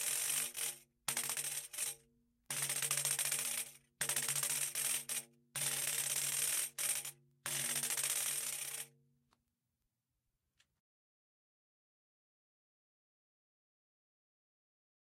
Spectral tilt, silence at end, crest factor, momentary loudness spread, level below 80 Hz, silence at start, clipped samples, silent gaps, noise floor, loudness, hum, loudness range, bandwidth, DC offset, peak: 0.5 dB/octave; 6.15 s; 26 dB; 9 LU; -84 dBFS; 0 s; under 0.1%; none; -88 dBFS; -36 LUFS; none; 5 LU; 17 kHz; under 0.1%; -16 dBFS